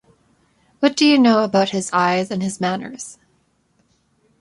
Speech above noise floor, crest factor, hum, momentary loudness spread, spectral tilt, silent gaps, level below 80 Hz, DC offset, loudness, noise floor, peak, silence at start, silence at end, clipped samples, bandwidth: 45 dB; 18 dB; none; 16 LU; -4.5 dB/octave; none; -62 dBFS; under 0.1%; -17 LUFS; -63 dBFS; -2 dBFS; 0.8 s; 1.3 s; under 0.1%; 11.5 kHz